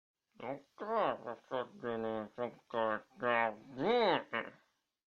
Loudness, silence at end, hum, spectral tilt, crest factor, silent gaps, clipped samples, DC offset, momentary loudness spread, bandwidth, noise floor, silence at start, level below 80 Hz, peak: -37 LUFS; 0.55 s; none; -6.5 dB/octave; 20 dB; none; under 0.1%; under 0.1%; 14 LU; 7 kHz; -74 dBFS; 0.4 s; -74 dBFS; -18 dBFS